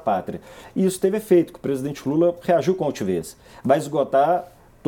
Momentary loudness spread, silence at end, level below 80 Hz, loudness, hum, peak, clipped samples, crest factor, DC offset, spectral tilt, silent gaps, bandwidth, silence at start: 11 LU; 0.4 s; -58 dBFS; -22 LUFS; none; -4 dBFS; under 0.1%; 18 dB; under 0.1%; -6.5 dB/octave; none; 18 kHz; 0.05 s